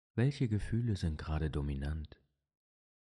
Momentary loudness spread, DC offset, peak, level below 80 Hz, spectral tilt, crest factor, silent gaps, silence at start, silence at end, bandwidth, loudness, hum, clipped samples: 8 LU; under 0.1%; -18 dBFS; -44 dBFS; -8 dB/octave; 18 dB; none; 0.15 s; 1 s; 11 kHz; -36 LUFS; none; under 0.1%